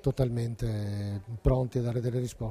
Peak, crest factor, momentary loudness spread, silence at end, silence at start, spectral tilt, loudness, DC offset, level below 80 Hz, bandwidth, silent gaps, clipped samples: -12 dBFS; 18 dB; 6 LU; 0 s; 0.05 s; -8 dB/octave; -31 LUFS; under 0.1%; -40 dBFS; 13.5 kHz; none; under 0.1%